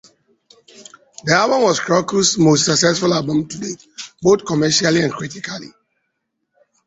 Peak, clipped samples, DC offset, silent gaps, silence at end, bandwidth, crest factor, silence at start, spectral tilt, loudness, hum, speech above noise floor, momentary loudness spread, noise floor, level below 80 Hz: 0 dBFS; under 0.1%; under 0.1%; none; 1.2 s; 8.2 kHz; 18 dB; 0.8 s; -4 dB/octave; -16 LUFS; none; 57 dB; 15 LU; -73 dBFS; -54 dBFS